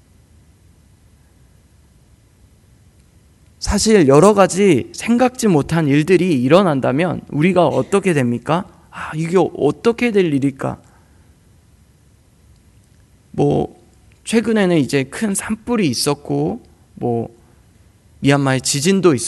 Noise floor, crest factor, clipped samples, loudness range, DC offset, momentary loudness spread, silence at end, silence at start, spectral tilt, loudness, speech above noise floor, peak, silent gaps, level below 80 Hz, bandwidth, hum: -51 dBFS; 18 dB; under 0.1%; 10 LU; under 0.1%; 12 LU; 0 s; 3.6 s; -5.5 dB/octave; -16 LUFS; 36 dB; 0 dBFS; none; -42 dBFS; 12.5 kHz; none